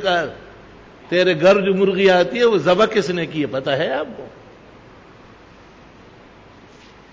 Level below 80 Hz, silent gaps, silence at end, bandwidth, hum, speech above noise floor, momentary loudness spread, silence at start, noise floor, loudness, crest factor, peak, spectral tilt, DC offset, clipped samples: -54 dBFS; none; 2.85 s; 7.8 kHz; none; 28 dB; 16 LU; 0 s; -45 dBFS; -17 LUFS; 16 dB; -4 dBFS; -5.5 dB/octave; under 0.1%; under 0.1%